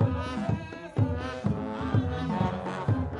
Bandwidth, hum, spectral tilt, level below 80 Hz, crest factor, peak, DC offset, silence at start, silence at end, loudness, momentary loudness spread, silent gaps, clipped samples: 10 kHz; none; -8 dB/octave; -48 dBFS; 16 dB; -12 dBFS; under 0.1%; 0 s; 0 s; -30 LUFS; 4 LU; none; under 0.1%